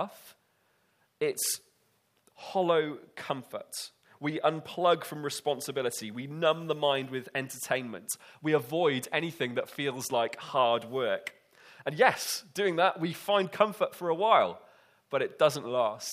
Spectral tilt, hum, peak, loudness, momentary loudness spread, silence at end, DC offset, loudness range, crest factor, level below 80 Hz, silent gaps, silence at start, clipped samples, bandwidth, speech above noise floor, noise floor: -3.5 dB/octave; none; -6 dBFS; -30 LUFS; 12 LU; 0 s; under 0.1%; 5 LU; 24 dB; -80 dBFS; none; 0 s; under 0.1%; 15.5 kHz; 41 dB; -71 dBFS